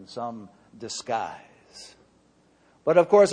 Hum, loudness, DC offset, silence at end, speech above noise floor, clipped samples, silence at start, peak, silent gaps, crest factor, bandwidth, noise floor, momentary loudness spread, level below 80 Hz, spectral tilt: none; -25 LUFS; under 0.1%; 0 s; 38 dB; under 0.1%; 0 s; -6 dBFS; none; 20 dB; 10 kHz; -61 dBFS; 26 LU; -70 dBFS; -4.5 dB/octave